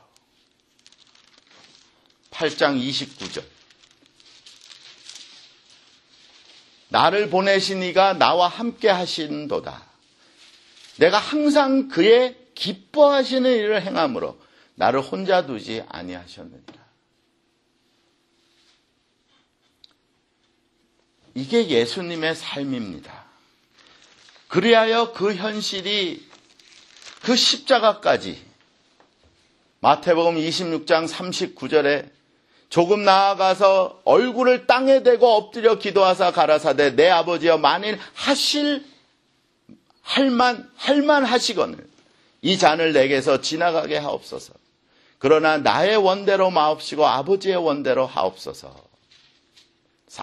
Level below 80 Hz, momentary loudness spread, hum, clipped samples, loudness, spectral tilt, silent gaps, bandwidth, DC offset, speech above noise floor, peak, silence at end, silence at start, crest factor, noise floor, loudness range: -66 dBFS; 15 LU; none; under 0.1%; -19 LUFS; -4 dB/octave; none; 12.5 kHz; under 0.1%; 47 dB; 0 dBFS; 0 s; 2.3 s; 22 dB; -67 dBFS; 11 LU